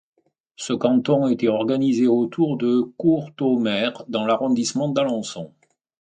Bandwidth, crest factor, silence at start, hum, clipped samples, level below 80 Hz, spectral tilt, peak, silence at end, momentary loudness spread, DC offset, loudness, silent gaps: 9.4 kHz; 16 dB; 0.6 s; none; under 0.1%; -68 dBFS; -5.5 dB/octave; -4 dBFS; 0.5 s; 9 LU; under 0.1%; -21 LUFS; none